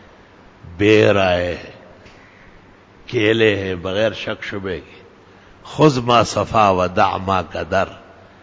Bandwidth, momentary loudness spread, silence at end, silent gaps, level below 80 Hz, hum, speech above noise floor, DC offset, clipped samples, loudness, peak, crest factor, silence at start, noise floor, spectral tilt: 8 kHz; 14 LU; 0.45 s; none; -42 dBFS; none; 29 dB; under 0.1%; under 0.1%; -17 LUFS; 0 dBFS; 18 dB; 0.65 s; -46 dBFS; -5.5 dB/octave